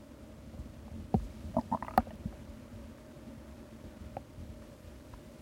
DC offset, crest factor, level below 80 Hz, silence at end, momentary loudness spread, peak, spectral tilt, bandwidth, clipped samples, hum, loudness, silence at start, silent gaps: under 0.1%; 30 dB; -50 dBFS; 0 s; 18 LU; -8 dBFS; -7.5 dB/octave; 16 kHz; under 0.1%; none; -39 LUFS; 0 s; none